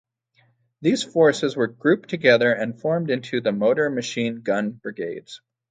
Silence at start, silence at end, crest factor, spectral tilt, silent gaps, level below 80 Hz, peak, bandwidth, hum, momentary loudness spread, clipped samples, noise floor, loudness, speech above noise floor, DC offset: 0.8 s; 0.35 s; 20 dB; -5 dB/octave; none; -68 dBFS; -2 dBFS; 9.4 kHz; none; 13 LU; under 0.1%; -63 dBFS; -22 LUFS; 42 dB; under 0.1%